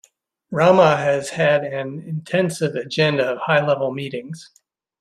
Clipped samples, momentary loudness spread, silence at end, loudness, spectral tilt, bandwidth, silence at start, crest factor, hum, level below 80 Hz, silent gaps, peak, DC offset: under 0.1%; 15 LU; 0.6 s; -19 LUFS; -5.5 dB/octave; 13 kHz; 0.5 s; 18 dB; none; -62 dBFS; none; -2 dBFS; under 0.1%